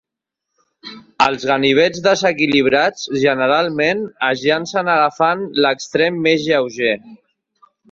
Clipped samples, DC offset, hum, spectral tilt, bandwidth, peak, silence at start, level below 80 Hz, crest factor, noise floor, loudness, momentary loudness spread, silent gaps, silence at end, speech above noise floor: under 0.1%; under 0.1%; none; -4.5 dB/octave; 7.8 kHz; 0 dBFS; 0.85 s; -58 dBFS; 16 dB; -81 dBFS; -16 LUFS; 5 LU; none; 0.75 s; 65 dB